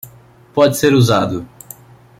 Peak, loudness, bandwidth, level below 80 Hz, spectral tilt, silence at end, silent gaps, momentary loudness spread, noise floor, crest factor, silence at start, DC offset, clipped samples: -2 dBFS; -14 LUFS; 16.5 kHz; -50 dBFS; -5.5 dB/octave; 0.75 s; none; 23 LU; -44 dBFS; 14 dB; 0.05 s; under 0.1%; under 0.1%